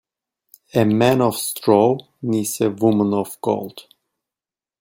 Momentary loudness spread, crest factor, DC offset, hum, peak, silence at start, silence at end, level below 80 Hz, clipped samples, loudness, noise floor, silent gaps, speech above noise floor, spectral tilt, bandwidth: 8 LU; 18 dB; under 0.1%; none; -2 dBFS; 0.75 s; 1 s; -60 dBFS; under 0.1%; -19 LUFS; under -90 dBFS; none; over 72 dB; -5.5 dB/octave; 17 kHz